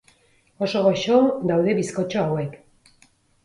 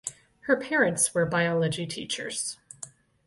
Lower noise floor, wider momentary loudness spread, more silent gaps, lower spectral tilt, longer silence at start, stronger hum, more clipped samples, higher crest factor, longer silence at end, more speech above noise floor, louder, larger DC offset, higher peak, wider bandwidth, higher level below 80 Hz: first, -60 dBFS vs -48 dBFS; second, 10 LU vs 18 LU; neither; first, -6 dB/octave vs -3.5 dB/octave; first, 0.6 s vs 0.05 s; neither; neither; about the same, 18 dB vs 20 dB; first, 0.9 s vs 0.4 s; first, 39 dB vs 21 dB; first, -21 LUFS vs -26 LUFS; neither; about the same, -6 dBFS vs -8 dBFS; about the same, 11.5 kHz vs 12 kHz; about the same, -62 dBFS vs -64 dBFS